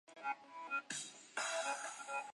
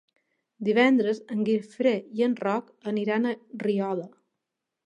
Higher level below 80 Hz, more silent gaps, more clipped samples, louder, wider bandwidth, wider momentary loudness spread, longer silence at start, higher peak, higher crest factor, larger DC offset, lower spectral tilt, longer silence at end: second, under -90 dBFS vs -82 dBFS; neither; neither; second, -43 LUFS vs -26 LUFS; first, 11.5 kHz vs 9.6 kHz; second, 6 LU vs 10 LU; second, 0.1 s vs 0.6 s; second, -26 dBFS vs -8 dBFS; about the same, 18 dB vs 20 dB; neither; second, 0 dB/octave vs -7 dB/octave; second, 0 s vs 0.8 s